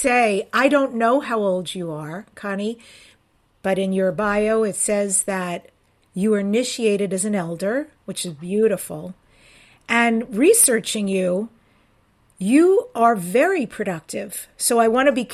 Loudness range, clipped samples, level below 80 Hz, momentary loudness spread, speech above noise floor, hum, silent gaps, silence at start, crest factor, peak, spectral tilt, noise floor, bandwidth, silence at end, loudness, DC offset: 5 LU; under 0.1%; -58 dBFS; 13 LU; 42 dB; none; none; 0 s; 18 dB; -2 dBFS; -4 dB/octave; -61 dBFS; 16 kHz; 0 s; -20 LUFS; under 0.1%